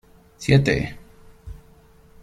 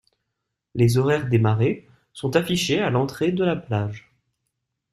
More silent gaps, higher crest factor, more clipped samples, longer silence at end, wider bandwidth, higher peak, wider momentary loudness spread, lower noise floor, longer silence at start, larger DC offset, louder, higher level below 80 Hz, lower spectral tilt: neither; about the same, 22 dB vs 18 dB; neither; second, 0.65 s vs 0.95 s; second, 12 kHz vs 13.5 kHz; about the same, -4 dBFS vs -4 dBFS; first, 26 LU vs 12 LU; second, -51 dBFS vs -80 dBFS; second, 0.4 s vs 0.75 s; neither; about the same, -21 LUFS vs -22 LUFS; first, -42 dBFS vs -54 dBFS; about the same, -6.5 dB/octave vs -6 dB/octave